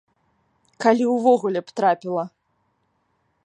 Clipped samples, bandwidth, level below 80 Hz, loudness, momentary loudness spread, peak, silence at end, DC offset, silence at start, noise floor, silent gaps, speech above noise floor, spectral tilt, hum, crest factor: under 0.1%; 10 kHz; -78 dBFS; -21 LUFS; 10 LU; -4 dBFS; 1.15 s; under 0.1%; 0.8 s; -69 dBFS; none; 50 dB; -6 dB/octave; none; 20 dB